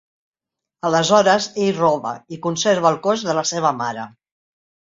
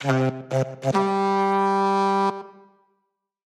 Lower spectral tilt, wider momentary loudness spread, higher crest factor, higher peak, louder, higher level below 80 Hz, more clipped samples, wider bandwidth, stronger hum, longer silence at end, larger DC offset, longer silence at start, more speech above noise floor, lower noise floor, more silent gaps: second, -4 dB/octave vs -6.5 dB/octave; first, 12 LU vs 6 LU; about the same, 18 dB vs 16 dB; first, -2 dBFS vs -6 dBFS; first, -18 LUFS vs -22 LUFS; first, -64 dBFS vs -72 dBFS; neither; second, 7.8 kHz vs 11.5 kHz; neither; second, 0.75 s vs 1 s; neither; first, 0.85 s vs 0 s; about the same, 51 dB vs 53 dB; second, -69 dBFS vs -76 dBFS; neither